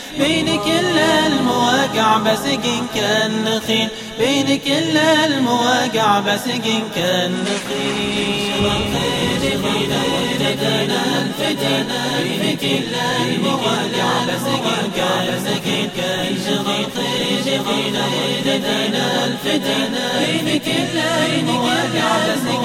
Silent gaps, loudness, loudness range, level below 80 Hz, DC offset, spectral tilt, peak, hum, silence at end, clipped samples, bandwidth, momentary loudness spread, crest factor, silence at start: none; -17 LUFS; 3 LU; -46 dBFS; under 0.1%; -4 dB/octave; -2 dBFS; none; 0 s; under 0.1%; 16.5 kHz; 4 LU; 16 dB; 0 s